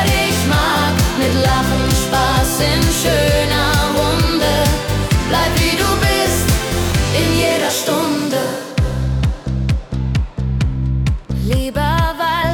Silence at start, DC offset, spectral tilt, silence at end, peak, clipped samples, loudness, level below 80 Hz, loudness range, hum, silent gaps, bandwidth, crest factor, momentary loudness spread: 0 s; under 0.1%; -4.5 dB/octave; 0 s; -2 dBFS; under 0.1%; -16 LUFS; -24 dBFS; 4 LU; none; none; 19 kHz; 12 dB; 5 LU